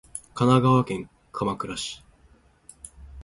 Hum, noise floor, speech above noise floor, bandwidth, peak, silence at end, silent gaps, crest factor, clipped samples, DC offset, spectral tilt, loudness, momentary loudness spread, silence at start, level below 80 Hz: none; -58 dBFS; 35 dB; 11.5 kHz; -4 dBFS; 0 s; none; 22 dB; under 0.1%; under 0.1%; -6.5 dB/octave; -24 LUFS; 25 LU; 0.15 s; -52 dBFS